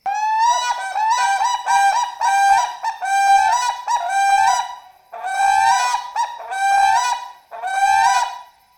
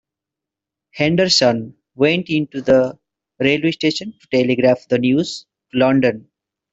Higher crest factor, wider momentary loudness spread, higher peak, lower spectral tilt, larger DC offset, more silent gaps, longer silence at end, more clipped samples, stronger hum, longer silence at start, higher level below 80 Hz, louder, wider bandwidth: about the same, 16 dB vs 18 dB; about the same, 10 LU vs 12 LU; about the same, -2 dBFS vs -2 dBFS; second, 2.5 dB/octave vs -5 dB/octave; neither; neither; second, 0.35 s vs 0.55 s; neither; neither; second, 0.05 s vs 0.95 s; about the same, -58 dBFS vs -56 dBFS; about the same, -17 LUFS vs -17 LUFS; first, over 20 kHz vs 8 kHz